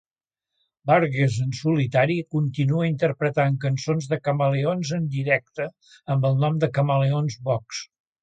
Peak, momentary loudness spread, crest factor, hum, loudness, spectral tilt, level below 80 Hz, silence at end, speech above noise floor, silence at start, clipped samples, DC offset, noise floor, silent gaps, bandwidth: -6 dBFS; 10 LU; 18 dB; none; -23 LUFS; -7 dB/octave; -62 dBFS; 0.4 s; 65 dB; 0.85 s; under 0.1%; under 0.1%; -87 dBFS; none; 8.8 kHz